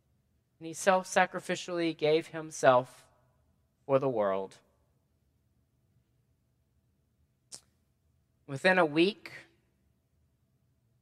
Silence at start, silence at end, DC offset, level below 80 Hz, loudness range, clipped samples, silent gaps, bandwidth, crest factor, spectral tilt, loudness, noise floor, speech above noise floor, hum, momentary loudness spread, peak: 0.6 s; 1.6 s; under 0.1%; -78 dBFS; 6 LU; under 0.1%; none; 14.5 kHz; 26 dB; -4.5 dB/octave; -29 LUFS; -73 dBFS; 44 dB; none; 22 LU; -6 dBFS